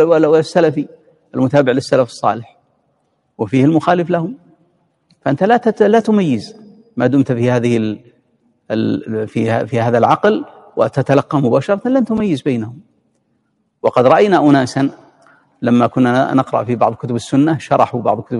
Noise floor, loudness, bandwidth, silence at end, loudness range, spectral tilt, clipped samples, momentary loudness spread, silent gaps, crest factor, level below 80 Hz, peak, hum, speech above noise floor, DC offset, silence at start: -64 dBFS; -15 LUFS; 11.5 kHz; 0 s; 3 LU; -7.5 dB/octave; under 0.1%; 11 LU; none; 14 dB; -56 dBFS; 0 dBFS; none; 50 dB; under 0.1%; 0 s